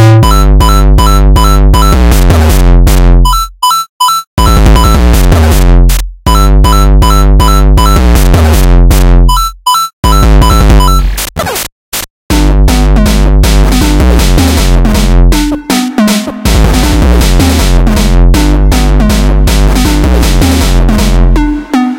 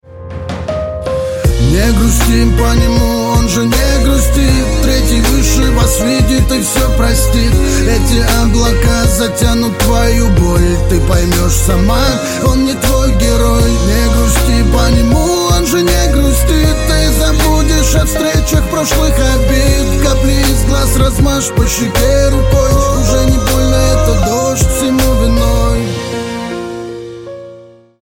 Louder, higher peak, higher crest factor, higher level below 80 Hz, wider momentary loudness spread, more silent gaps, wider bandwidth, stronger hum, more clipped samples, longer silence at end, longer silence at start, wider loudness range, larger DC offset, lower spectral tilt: first, -7 LUFS vs -11 LUFS; about the same, 0 dBFS vs 0 dBFS; second, 4 dB vs 10 dB; first, -6 dBFS vs -14 dBFS; about the same, 4 LU vs 5 LU; first, 3.89-4.00 s, 4.27-4.37 s, 9.93-10.03 s, 11.72-11.92 s, 12.10-12.29 s vs none; about the same, 16.5 kHz vs 17 kHz; neither; first, 0.3% vs under 0.1%; second, 0 s vs 0.4 s; about the same, 0 s vs 0.1 s; about the same, 2 LU vs 1 LU; neither; about the same, -5.5 dB/octave vs -5 dB/octave